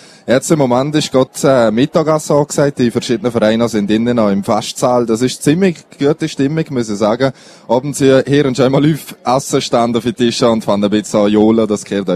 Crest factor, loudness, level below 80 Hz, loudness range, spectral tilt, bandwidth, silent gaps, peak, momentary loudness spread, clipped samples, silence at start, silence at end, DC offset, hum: 12 dB; -13 LUFS; -48 dBFS; 2 LU; -5.5 dB/octave; 14.5 kHz; none; 0 dBFS; 5 LU; under 0.1%; 0.25 s; 0 s; under 0.1%; none